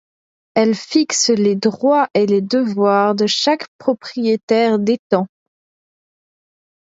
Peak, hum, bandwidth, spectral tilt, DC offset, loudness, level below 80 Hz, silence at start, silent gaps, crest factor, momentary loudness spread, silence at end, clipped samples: 0 dBFS; none; 8 kHz; -4 dB/octave; under 0.1%; -16 LUFS; -68 dBFS; 0.55 s; 3.68-3.79 s, 4.43-4.48 s, 4.99-5.10 s; 16 dB; 6 LU; 1.65 s; under 0.1%